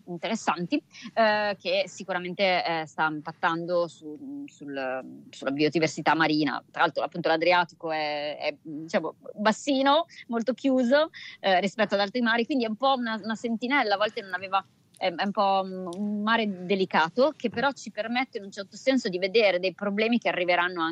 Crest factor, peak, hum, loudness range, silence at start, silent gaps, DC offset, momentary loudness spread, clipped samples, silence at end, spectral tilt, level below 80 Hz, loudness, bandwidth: 16 dB; -10 dBFS; none; 3 LU; 0.05 s; none; under 0.1%; 10 LU; under 0.1%; 0 s; -4.5 dB/octave; -78 dBFS; -26 LUFS; 11 kHz